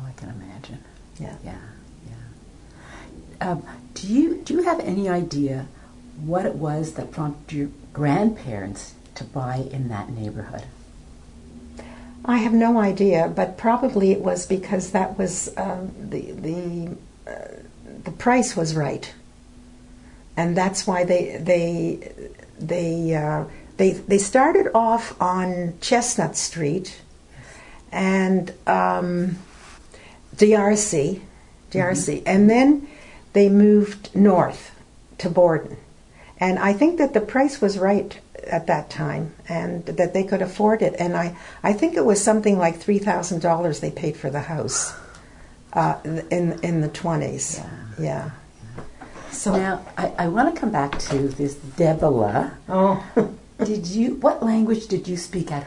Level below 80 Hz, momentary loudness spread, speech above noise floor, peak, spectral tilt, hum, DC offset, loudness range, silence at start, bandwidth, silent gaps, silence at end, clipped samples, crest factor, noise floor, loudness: -48 dBFS; 20 LU; 26 dB; -2 dBFS; -5.5 dB/octave; none; under 0.1%; 8 LU; 0 s; 11 kHz; none; 0 s; under 0.1%; 20 dB; -47 dBFS; -21 LUFS